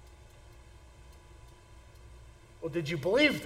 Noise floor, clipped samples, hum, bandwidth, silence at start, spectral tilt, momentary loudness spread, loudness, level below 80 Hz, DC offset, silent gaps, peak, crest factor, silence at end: -54 dBFS; under 0.1%; none; 16 kHz; 0.05 s; -5 dB/octave; 28 LU; -30 LUFS; -56 dBFS; under 0.1%; none; -12 dBFS; 22 dB; 0 s